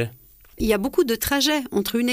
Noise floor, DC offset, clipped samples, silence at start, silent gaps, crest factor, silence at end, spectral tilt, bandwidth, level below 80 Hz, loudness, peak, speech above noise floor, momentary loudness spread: -49 dBFS; under 0.1%; under 0.1%; 0 s; none; 16 dB; 0 s; -3.5 dB/octave; 15.5 kHz; -42 dBFS; -22 LUFS; -8 dBFS; 27 dB; 6 LU